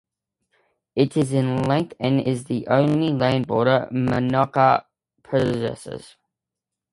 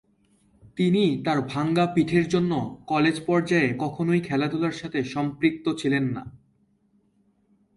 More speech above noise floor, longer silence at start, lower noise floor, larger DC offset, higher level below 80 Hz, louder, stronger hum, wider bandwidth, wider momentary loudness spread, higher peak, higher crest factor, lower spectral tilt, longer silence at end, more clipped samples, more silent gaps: first, 65 dB vs 42 dB; first, 0.95 s vs 0.75 s; first, -86 dBFS vs -66 dBFS; neither; about the same, -56 dBFS vs -60 dBFS; first, -21 LUFS vs -24 LUFS; neither; about the same, 11.5 kHz vs 11.5 kHz; about the same, 8 LU vs 7 LU; first, -2 dBFS vs -8 dBFS; about the same, 20 dB vs 18 dB; about the same, -7 dB/octave vs -6.5 dB/octave; second, 0.9 s vs 1.4 s; neither; neither